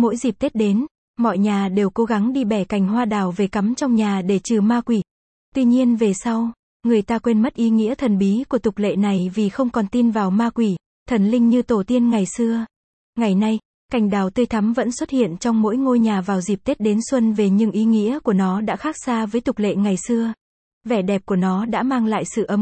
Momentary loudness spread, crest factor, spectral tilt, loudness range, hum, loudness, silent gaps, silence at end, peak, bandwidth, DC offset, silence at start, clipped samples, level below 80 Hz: 5 LU; 12 dB; -6.5 dB/octave; 2 LU; none; -19 LUFS; 0.91-1.14 s, 5.11-5.52 s, 6.59-6.80 s, 10.86-11.06 s, 12.76-13.13 s, 13.65-13.89 s, 20.41-20.81 s; 0 s; -6 dBFS; 8.8 kHz; under 0.1%; 0 s; under 0.1%; -52 dBFS